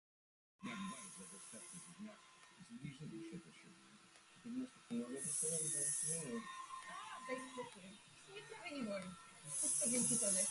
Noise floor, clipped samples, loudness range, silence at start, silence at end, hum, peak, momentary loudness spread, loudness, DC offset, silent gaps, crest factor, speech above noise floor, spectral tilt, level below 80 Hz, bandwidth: -65 dBFS; under 0.1%; 12 LU; 0.6 s; 0 s; none; -26 dBFS; 24 LU; -42 LUFS; under 0.1%; none; 20 dB; 22 dB; -2.5 dB/octave; -82 dBFS; 12 kHz